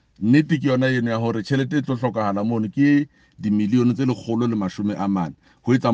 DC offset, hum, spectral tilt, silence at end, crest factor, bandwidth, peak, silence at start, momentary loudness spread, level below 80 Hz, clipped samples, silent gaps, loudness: under 0.1%; none; -7.5 dB/octave; 0 s; 16 dB; 7.8 kHz; -4 dBFS; 0.2 s; 7 LU; -60 dBFS; under 0.1%; none; -21 LUFS